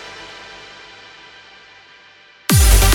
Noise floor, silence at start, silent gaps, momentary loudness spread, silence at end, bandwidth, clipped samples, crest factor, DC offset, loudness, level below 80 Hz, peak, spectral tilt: -46 dBFS; 0.05 s; none; 27 LU; 0 s; 17.5 kHz; under 0.1%; 18 dB; under 0.1%; -14 LUFS; -20 dBFS; 0 dBFS; -3.5 dB/octave